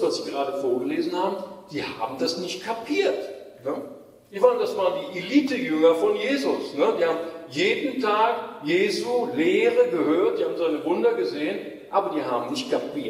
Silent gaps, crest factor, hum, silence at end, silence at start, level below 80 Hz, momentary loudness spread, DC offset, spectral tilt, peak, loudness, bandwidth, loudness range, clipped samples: none; 18 dB; none; 0 s; 0 s; -72 dBFS; 11 LU; under 0.1%; -4.5 dB/octave; -6 dBFS; -24 LUFS; 15 kHz; 4 LU; under 0.1%